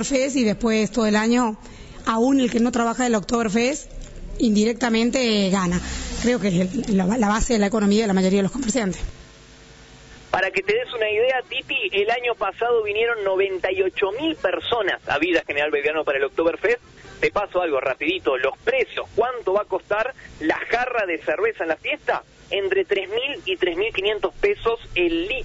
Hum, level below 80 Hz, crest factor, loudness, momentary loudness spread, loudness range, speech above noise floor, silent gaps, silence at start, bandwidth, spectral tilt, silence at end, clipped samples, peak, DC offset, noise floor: none; -42 dBFS; 16 dB; -22 LUFS; 5 LU; 3 LU; 25 dB; none; 0 s; 8 kHz; -4.5 dB/octave; 0 s; under 0.1%; -6 dBFS; under 0.1%; -46 dBFS